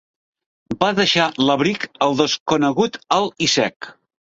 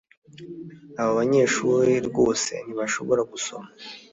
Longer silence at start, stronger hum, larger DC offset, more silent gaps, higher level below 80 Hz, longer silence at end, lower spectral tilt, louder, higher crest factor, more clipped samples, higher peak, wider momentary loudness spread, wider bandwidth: first, 0.7 s vs 0.35 s; neither; neither; first, 2.40-2.46 s, 3.76-3.80 s vs none; about the same, -58 dBFS vs -62 dBFS; first, 0.3 s vs 0.15 s; about the same, -3.5 dB/octave vs -4 dB/octave; first, -18 LUFS vs -23 LUFS; about the same, 18 dB vs 16 dB; neither; first, -2 dBFS vs -8 dBFS; second, 7 LU vs 20 LU; about the same, 8 kHz vs 8 kHz